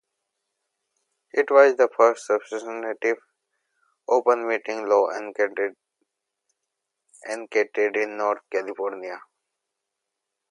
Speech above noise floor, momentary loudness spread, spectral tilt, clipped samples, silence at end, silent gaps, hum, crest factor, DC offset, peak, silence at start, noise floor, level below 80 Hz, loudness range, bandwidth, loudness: 61 dB; 15 LU; -3 dB/octave; under 0.1%; 1.3 s; none; none; 22 dB; under 0.1%; -2 dBFS; 1.35 s; -83 dBFS; -86 dBFS; 6 LU; 11 kHz; -23 LUFS